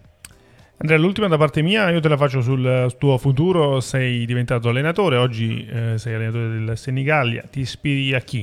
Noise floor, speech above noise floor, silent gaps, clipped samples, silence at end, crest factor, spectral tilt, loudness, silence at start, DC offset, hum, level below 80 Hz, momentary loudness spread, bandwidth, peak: -50 dBFS; 31 dB; none; under 0.1%; 0 s; 16 dB; -6.5 dB/octave; -19 LUFS; 0.8 s; under 0.1%; none; -50 dBFS; 7 LU; 12.5 kHz; -2 dBFS